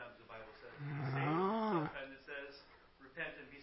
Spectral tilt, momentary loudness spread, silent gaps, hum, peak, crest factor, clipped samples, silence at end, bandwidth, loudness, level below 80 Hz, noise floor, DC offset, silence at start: -5.5 dB/octave; 19 LU; none; none; -24 dBFS; 18 dB; under 0.1%; 0 s; 5.6 kHz; -40 LUFS; -72 dBFS; -62 dBFS; under 0.1%; 0 s